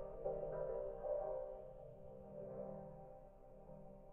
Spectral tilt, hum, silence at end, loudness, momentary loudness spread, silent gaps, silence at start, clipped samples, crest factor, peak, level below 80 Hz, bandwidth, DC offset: -5.5 dB/octave; none; 0 s; -48 LUFS; 16 LU; none; 0 s; under 0.1%; 16 dB; -32 dBFS; -62 dBFS; 3.3 kHz; under 0.1%